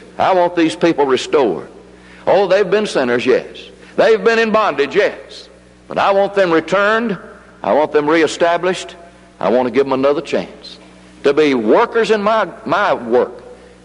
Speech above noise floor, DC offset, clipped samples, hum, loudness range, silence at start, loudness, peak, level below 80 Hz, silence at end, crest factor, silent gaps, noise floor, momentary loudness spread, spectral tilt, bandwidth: 25 dB; under 0.1%; under 0.1%; none; 2 LU; 0 s; -15 LUFS; -2 dBFS; -52 dBFS; 0.3 s; 14 dB; none; -39 dBFS; 12 LU; -5 dB/octave; 11 kHz